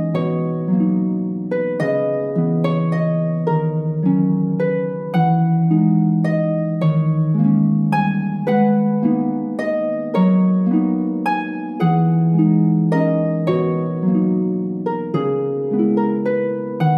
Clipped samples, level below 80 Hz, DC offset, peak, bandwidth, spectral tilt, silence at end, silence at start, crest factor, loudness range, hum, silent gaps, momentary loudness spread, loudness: under 0.1%; -58 dBFS; under 0.1%; -4 dBFS; 5.2 kHz; -10.5 dB/octave; 0 s; 0 s; 12 dB; 2 LU; none; none; 6 LU; -18 LUFS